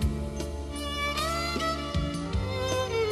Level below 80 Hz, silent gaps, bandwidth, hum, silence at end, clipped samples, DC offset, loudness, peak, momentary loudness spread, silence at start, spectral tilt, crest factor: -36 dBFS; none; 13.5 kHz; none; 0 s; under 0.1%; under 0.1%; -30 LUFS; -16 dBFS; 6 LU; 0 s; -4.5 dB/octave; 14 dB